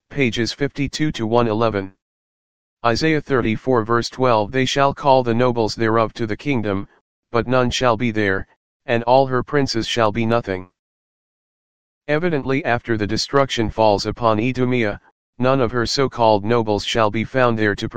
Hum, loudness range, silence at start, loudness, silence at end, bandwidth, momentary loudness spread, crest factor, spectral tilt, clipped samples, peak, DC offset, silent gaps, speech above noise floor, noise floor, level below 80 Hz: none; 4 LU; 0 s; -19 LUFS; 0 s; 9.6 kHz; 7 LU; 18 dB; -5.5 dB/octave; under 0.1%; 0 dBFS; 2%; 2.02-2.77 s, 7.01-7.23 s, 8.56-8.80 s, 10.79-12.01 s, 15.12-15.33 s; over 72 dB; under -90 dBFS; -44 dBFS